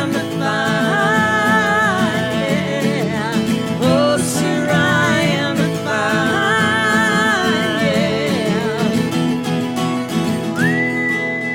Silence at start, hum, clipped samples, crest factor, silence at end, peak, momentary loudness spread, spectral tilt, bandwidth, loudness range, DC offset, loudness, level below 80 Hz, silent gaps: 0 s; none; under 0.1%; 14 dB; 0 s; -2 dBFS; 5 LU; -5 dB/octave; 17.5 kHz; 3 LU; under 0.1%; -16 LUFS; -52 dBFS; none